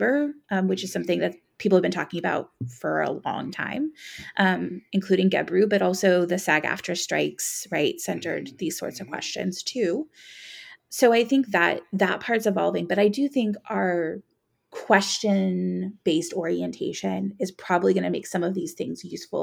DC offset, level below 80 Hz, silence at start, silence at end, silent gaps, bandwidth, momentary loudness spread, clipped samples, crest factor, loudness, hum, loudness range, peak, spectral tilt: under 0.1%; -72 dBFS; 0 s; 0 s; none; 17.5 kHz; 11 LU; under 0.1%; 22 dB; -25 LUFS; none; 5 LU; -2 dBFS; -4.5 dB/octave